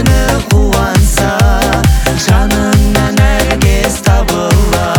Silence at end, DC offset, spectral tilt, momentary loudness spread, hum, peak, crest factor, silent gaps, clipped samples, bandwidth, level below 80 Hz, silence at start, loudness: 0 s; under 0.1%; -5 dB/octave; 1 LU; none; 0 dBFS; 8 dB; none; under 0.1%; over 20 kHz; -14 dBFS; 0 s; -10 LUFS